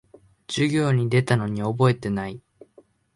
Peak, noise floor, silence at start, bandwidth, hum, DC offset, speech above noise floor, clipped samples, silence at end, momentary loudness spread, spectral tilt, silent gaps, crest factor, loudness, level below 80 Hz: -6 dBFS; -56 dBFS; 0.5 s; 11.5 kHz; none; under 0.1%; 35 dB; under 0.1%; 0.75 s; 10 LU; -6.5 dB/octave; none; 18 dB; -23 LUFS; -56 dBFS